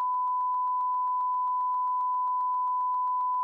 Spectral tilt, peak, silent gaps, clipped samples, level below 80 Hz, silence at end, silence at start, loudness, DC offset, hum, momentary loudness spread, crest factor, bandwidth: -2.5 dB/octave; -24 dBFS; none; under 0.1%; under -90 dBFS; 0 s; 0 s; -28 LUFS; under 0.1%; none; 0 LU; 4 dB; 1.8 kHz